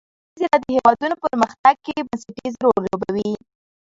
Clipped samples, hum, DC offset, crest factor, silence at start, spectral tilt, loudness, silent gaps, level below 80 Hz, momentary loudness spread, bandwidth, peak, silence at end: under 0.1%; none; under 0.1%; 20 dB; 0.35 s; -6 dB/octave; -20 LUFS; 1.59-1.64 s; -56 dBFS; 12 LU; 7.8 kHz; 0 dBFS; 0.5 s